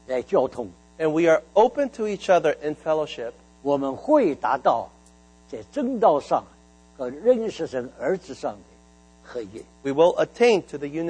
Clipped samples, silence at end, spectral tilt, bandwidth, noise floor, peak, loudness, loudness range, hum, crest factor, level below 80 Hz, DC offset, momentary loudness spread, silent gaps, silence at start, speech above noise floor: under 0.1%; 0 s; -5.5 dB/octave; 9.4 kHz; -53 dBFS; -4 dBFS; -23 LUFS; 5 LU; 60 Hz at -55 dBFS; 18 dB; -58 dBFS; under 0.1%; 16 LU; none; 0.1 s; 30 dB